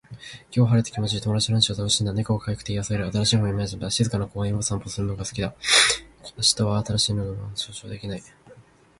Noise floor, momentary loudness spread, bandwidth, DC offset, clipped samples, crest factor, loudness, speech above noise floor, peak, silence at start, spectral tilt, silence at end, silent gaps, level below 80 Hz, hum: -51 dBFS; 13 LU; 11.5 kHz; under 0.1%; under 0.1%; 22 dB; -23 LUFS; 27 dB; -4 dBFS; 0.1 s; -3.5 dB/octave; 0.4 s; none; -46 dBFS; none